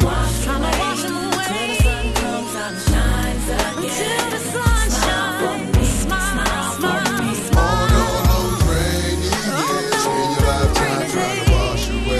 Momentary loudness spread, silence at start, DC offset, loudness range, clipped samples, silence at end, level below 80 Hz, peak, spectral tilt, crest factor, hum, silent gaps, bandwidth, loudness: 4 LU; 0 s; under 0.1%; 2 LU; under 0.1%; 0 s; -22 dBFS; -2 dBFS; -4.5 dB/octave; 16 dB; none; none; 13 kHz; -19 LUFS